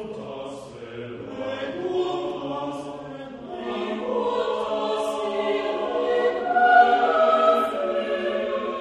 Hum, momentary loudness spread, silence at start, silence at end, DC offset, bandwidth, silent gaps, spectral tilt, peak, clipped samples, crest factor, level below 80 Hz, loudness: none; 18 LU; 0 s; 0 s; under 0.1%; 12.5 kHz; none; -5 dB/octave; -4 dBFS; under 0.1%; 20 dB; -62 dBFS; -23 LUFS